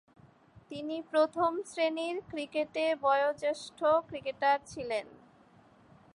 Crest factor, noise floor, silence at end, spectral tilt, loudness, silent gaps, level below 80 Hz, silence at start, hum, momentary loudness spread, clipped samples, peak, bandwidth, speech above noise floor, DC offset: 18 dB; -61 dBFS; 1.05 s; -4 dB/octave; -32 LUFS; none; -70 dBFS; 0.55 s; none; 10 LU; under 0.1%; -16 dBFS; 11.5 kHz; 30 dB; under 0.1%